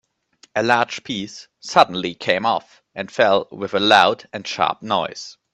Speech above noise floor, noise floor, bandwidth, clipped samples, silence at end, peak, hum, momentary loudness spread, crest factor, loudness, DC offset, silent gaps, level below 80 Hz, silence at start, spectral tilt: 36 dB; -56 dBFS; 11.5 kHz; under 0.1%; 0.2 s; 0 dBFS; none; 15 LU; 20 dB; -19 LUFS; under 0.1%; none; -64 dBFS; 0.55 s; -3.5 dB/octave